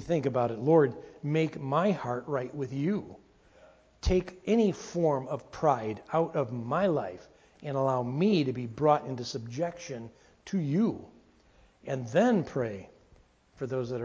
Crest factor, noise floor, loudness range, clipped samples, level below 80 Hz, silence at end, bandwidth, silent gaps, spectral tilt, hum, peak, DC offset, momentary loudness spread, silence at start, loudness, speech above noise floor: 20 dB; -62 dBFS; 3 LU; under 0.1%; -50 dBFS; 0 s; 7.8 kHz; none; -7 dB/octave; none; -10 dBFS; under 0.1%; 13 LU; 0 s; -30 LUFS; 33 dB